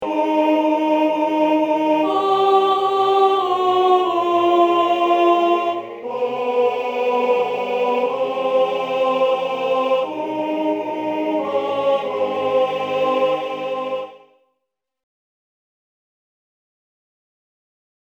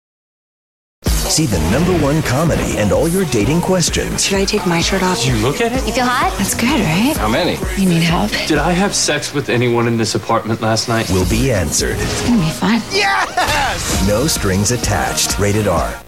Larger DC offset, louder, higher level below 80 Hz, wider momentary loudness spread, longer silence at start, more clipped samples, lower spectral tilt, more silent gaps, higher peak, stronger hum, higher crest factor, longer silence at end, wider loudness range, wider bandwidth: second, under 0.1% vs 0.7%; second, -19 LUFS vs -15 LUFS; second, -74 dBFS vs -28 dBFS; first, 8 LU vs 3 LU; second, 0 s vs 1.05 s; neither; first, -5.5 dB/octave vs -4 dB/octave; neither; about the same, -4 dBFS vs -2 dBFS; neither; about the same, 14 dB vs 12 dB; first, 3.9 s vs 0.05 s; first, 7 LU vs 1 LU; about the same, 17.5 kHz vs 17 kHz